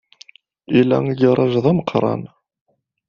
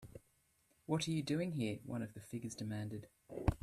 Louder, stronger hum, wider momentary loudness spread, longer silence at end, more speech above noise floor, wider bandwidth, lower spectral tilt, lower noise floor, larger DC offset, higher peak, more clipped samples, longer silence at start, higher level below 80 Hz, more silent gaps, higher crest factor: first, -17 LUFS vs -41 LUFS; neither; second, 6 LU vs 15 LU; first, 0.8 s vs 0.05 s; about the same, 32 dB vs 35 dB; second, 6.8 kHz vs 14.5 kHz; about the same, -7 dB/octave vs -6 dB/octave; second, -48 dBFS vs -76 dBFS; neither; first, -2 dBFS vs -16 dBFS; neither; first, 0.7 s vs 0 s; about the same, -54 dBFS vs -54 dBFS; neither; second, 16 dB vs 26 dB